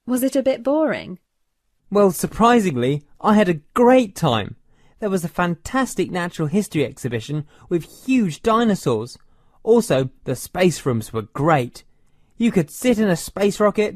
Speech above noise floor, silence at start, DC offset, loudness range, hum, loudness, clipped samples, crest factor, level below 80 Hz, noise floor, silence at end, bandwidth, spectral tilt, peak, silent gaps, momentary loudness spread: 50 dB; 0.05 s; under 0.1%; 5 LU; none; -20 LUFS; under 0.1%; 16 dB; -48 dBFS; -69 dBFS; 0 s; 14 kHz; -6 dB/octave; -2 dBFS; none; 10 LU